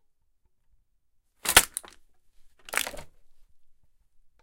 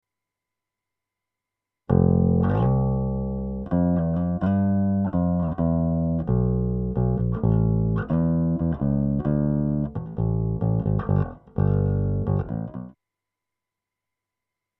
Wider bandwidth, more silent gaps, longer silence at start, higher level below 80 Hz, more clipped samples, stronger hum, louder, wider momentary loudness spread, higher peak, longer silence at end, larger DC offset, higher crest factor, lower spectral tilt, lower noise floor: first, 17 kHz vs 3.3 kHz; neither; second, 1.45 s vs 1.9 s; second, -50 dBFS vs -36 dBFS; neither; neither; about the same, -24 LUFS vs -24 LUFS; first, 16 LU vs 6 LU; first, 0 dBFS vs -4 dBFS; second, 1.35 s vs 1.9 s; neither; first, 32 dB vs 18 dB; second, 0.5 dB/octave vs -13.5 dB/octave; second, -68 dBFS vs -86 dBFS